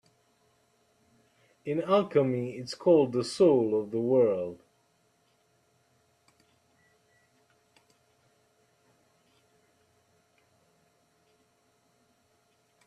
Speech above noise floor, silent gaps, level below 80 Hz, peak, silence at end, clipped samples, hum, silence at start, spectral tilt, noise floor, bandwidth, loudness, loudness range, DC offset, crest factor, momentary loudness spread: 44 dB; none; -76 dBFS; -12 dBFS; 8.3 s; under 0.1%; none; 1.65 s; -7 dB/octave; -70 dBFS; 11.5 kHz; -27 LUFS; 7 LU; under 0.1%; 20 dB; 13 LU